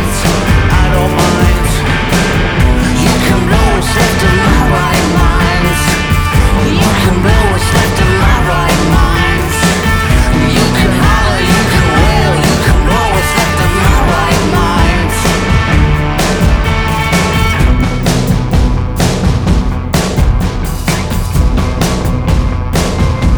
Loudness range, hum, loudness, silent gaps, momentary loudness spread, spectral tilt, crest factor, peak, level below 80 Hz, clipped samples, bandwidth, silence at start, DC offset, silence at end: 3 LU; none; -11 LUFS; none; 4 LU; -5 dB/octave; 10 dB; 0 dBFS; -14 dBFS; under 0.1%; over 20 kHz; 0 s; 0.4%; 0 s